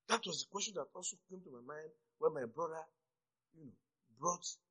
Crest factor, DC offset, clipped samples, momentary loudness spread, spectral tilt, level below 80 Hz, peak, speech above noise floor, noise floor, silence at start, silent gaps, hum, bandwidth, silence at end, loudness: 26 dB; under 0.1%; under 0.1%; 21 LU; -2 dB/octave; under -90 dBFS; -18 dBFS; over 46 dB; under -90 dBFS; 0.1 s; none; none; 9.6 kHz; 0.15 s; -42 LUFS